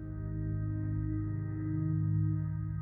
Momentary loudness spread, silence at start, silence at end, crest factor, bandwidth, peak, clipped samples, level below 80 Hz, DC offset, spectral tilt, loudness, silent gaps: 5 LU; 0 s; 0 s; 12 dB; 2.2 kHz; -22 dBFS; under 0.1%; -46 dBFS; under 0.1%; -14 dB/octave; -35 LUFS; none